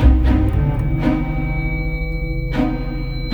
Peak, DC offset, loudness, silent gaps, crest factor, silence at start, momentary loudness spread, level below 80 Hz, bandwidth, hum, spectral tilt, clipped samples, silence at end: 0 dBFS; under 0.1%; -20 LUFS; none; 16 dB; 0 s; 8 LU; -20 dBFS; 5 kHz; none; -9 dB/octave; under 0.1%; 0 s